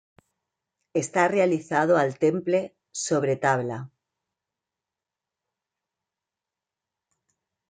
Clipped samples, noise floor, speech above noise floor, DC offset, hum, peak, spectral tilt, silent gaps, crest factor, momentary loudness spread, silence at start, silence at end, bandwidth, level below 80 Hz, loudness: under 0.1%; -89 dBFS; 65 dB; under 0.1%; none; -8 dBFS; -5.5 dB/octave; none; 20 dB; 12 LU; 0.95 s; 3.85 s; 9.6 kHz; -74 dBFS; -24 LUFS